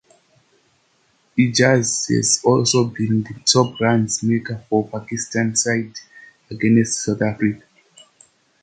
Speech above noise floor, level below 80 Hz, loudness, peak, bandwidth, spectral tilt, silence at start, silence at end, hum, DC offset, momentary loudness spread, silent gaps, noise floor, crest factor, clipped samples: 43 dB; -56 dBFS; -18 LUFS; -2 dBFS; 9.6 kHz; -4 dB/octave; 1.35 s; 1.05 s; none; under 0.1%; 10 LU; none; -62 dBFS; 18 dB; under 0.1%